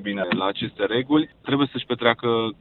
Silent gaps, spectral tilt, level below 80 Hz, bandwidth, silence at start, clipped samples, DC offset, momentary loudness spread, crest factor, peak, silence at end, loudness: none; -9.5 dB/octave; -60 dBFS; 4.3 kHz; 0 s; under 0.1%; under 0.1%; 5 LU; 20 dB; -2 dBFS; 0.1 s; -23 LUFS